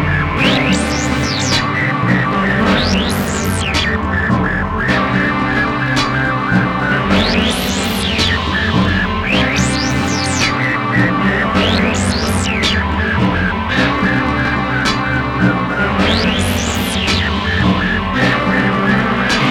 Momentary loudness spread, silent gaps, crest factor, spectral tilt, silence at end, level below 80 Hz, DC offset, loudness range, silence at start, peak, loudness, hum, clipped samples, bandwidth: 3 LU; none; 12 dB; -4.5 dB/octave; 0 s; -28 dBFS; under 0.1%; 1 LU; 0 s; -2 dBFS; -14 LUFS; none; under 0.1%; 17 kHz